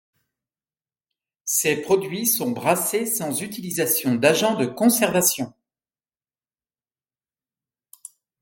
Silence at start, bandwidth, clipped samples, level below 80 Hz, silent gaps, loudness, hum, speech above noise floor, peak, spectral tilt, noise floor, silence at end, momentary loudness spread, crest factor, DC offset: 1.45 s; 17 kHz; under 0.1%; -68 dBFS; none; -21 LUFS; none; over 69 dB; -2 dBFS; -3.5 dB/octave; under -90 dBFS; 2.95 s; 9 LU; 22 dB; under 0.1%